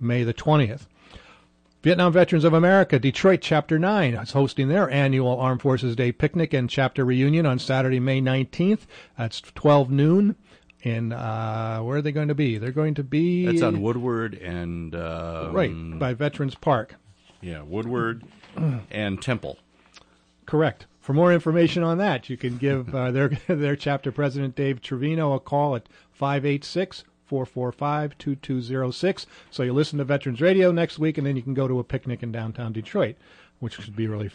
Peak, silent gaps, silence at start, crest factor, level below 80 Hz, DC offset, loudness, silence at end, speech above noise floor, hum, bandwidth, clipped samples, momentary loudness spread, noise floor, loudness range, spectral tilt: -8 dBFS; none; 0 s; 16 dB; -56 dBFS; under 0.1%; -23 LUFS; 0.05 s; 35 dB; none; 9.6 kHz; under 0.1%; 12 LU; -58 dBFS; 8 LU; -7.5 dB/octave